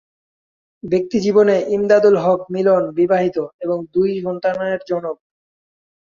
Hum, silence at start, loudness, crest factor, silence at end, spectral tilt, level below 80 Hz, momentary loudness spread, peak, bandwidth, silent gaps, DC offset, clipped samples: none; 0.85 s; -17 LUFS; 16 dB; 0.9 s; -7 dB/octave; -58 dBFS; 10 LU; -2 dBFS; 7.4 kHz; 3.54-3.59 s; under 0.1%; under 0.1%